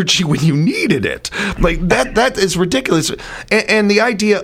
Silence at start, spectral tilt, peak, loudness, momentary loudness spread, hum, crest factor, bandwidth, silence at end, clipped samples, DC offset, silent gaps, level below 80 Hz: 0 s; -4.5 dB/octave; 0 dBFS; -14 LUFS; 7 LU; none; 14 dB; 16 kHz; 0 s; under 0.1%; under 0.1%; none; -30 dBFS